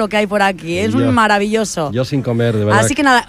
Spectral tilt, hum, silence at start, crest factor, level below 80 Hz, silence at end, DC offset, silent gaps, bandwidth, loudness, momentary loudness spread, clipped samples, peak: -5 dB/octave; none; 0 s; 14 dB; -44 dBFS; 0.05 s; under 0.1%; none; 15 kHz; -15 LUFS; 6 LU; under 0.1%; -2 dBFS